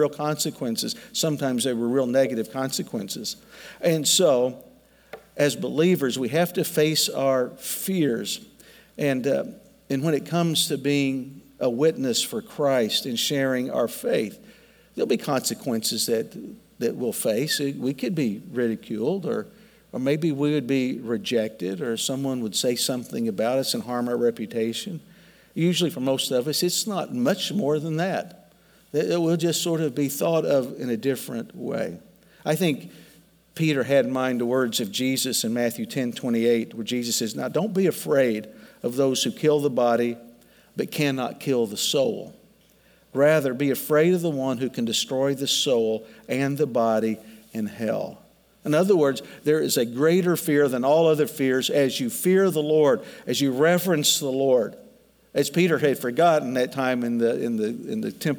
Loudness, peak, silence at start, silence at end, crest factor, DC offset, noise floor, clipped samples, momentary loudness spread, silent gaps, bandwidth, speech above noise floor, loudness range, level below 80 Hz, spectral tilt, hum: -24 LUFS; -8 dBFS; 0 s; 0 s; 16 dB; under 0.1%; -58 dBFS; under 0.1%; 10 LU; none; over 20 kHz; 34 dB; 5 LU; -68 dBFS; -4.5 dB/octave; none